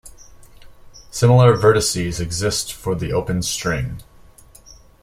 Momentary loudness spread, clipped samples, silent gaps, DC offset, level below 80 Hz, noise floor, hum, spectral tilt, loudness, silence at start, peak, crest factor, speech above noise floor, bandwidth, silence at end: 13 LU; under 0.1%; none; under 0.1%; -40 dBFS; -46 dBFS; none; -5 dB/octave; -18 LUFS; 0.05 s; -2 dBFS; 18 dB; 29 dB; 16 kHz; 1 s